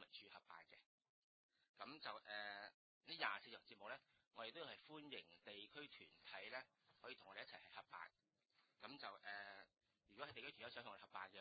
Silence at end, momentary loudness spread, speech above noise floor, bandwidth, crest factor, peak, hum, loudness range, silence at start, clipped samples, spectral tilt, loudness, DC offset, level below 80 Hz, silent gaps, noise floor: 0 s; 11 LU; 25 dB; 4.8 kHz; 28 dB; -28 dBFS; none; 5 LU; 0 s; under 0.1%; 0.5 dB/octave; -56 LUFS; under 0.1%; under -90 dBFS; 0.86-0.98 s, 1.09-1.49 s, 1.69-1.74 s, 2.74-3.01 s, 4.27-4.31 s; -82 dBFS